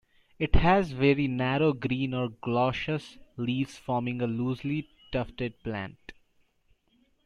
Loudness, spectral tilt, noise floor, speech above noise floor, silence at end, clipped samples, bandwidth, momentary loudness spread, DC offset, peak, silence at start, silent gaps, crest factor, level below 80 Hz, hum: -29 LUFS; -7.5 dB/octave; -68 dBFS; 41 dB; 1.15 s; under 0.1%; 10 kHz; 11 LU; under 0.1%; -8 dBFS; 0.4 s; none; 22 dB; -40 dBFS; none